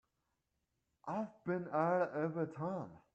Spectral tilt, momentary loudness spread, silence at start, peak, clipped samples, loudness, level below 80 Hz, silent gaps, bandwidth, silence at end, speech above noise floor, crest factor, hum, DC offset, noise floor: -9.5 dB/octave; 9 LU; 1.05 s; -20 dBFS; under 0.1%; -39 LUFS; -82 dBFS; none; 8.2 kHz; 0.15 s; 47 dB; 20 dB; none; under 0.1%; -85 dBFS